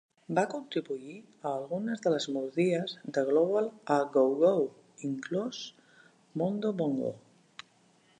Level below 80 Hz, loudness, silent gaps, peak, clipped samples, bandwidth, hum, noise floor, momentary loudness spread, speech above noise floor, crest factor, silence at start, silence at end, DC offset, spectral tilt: -82 dBFS; -31 LUFS; none; -12 dBFS; under 0.1%; 10 kHz; none; -65 dBFS; 16 LU; 35 dB; 18 dB; 0.3 s; 1 s; under 0.1%; -6 dB/octave